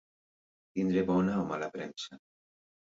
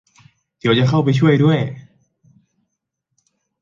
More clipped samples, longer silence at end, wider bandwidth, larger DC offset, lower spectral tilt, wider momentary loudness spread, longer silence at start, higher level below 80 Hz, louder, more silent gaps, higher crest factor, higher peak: neither; second, 0.8 s vs 1.8 s; about the same, 7.6 kHz vs 7.4 kHz; neither; about the same, -7 dB/octave vs -7.5 dB/octave; about the same, 14 LU vs 12 LU; about the same, 0.75 s vs 0.65 s; second, -64 dBFS vs -54 dBFS; second, -32 LUFS vs -16 LUFS; neither; about the same, 16 dB vs 16 dB; second, -18 dBFS vs -2 dBFS